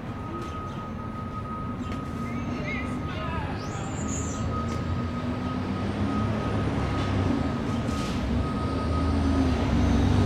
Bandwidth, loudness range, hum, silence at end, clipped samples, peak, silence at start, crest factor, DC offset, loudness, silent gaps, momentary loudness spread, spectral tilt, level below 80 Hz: 11.5 kHz; 6 LU; none; 0 s; under 0.1%; -12 dBFS; 0 s; 16 dB; under 0.1%; -29 LUFS; none; 9 LU; -6.5 dB/octave; -36 dBFS